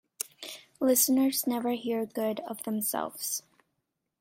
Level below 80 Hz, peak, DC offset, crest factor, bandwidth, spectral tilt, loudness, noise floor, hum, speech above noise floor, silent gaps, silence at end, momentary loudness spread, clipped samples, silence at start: -76 dBFS; -10 dBFS; under 0.1%; 20 dB; 16.5 kHz; -3 dB/octave; -29 LUFS; -82 dBFS; none; 53 dB; none; 0.8 s; 14 LU; under 0.1%; 0.4 s